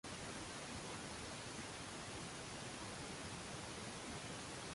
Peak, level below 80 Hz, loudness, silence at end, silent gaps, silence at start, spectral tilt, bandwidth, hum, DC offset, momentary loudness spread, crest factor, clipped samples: -36 dBFS; -64 dBFS; -48 LUFS; 0 s; none; 0.05 s; -3 dB/octave; 11.5 kHz; none; under 0.1%; 1 LU; 12 dB; under 0.1%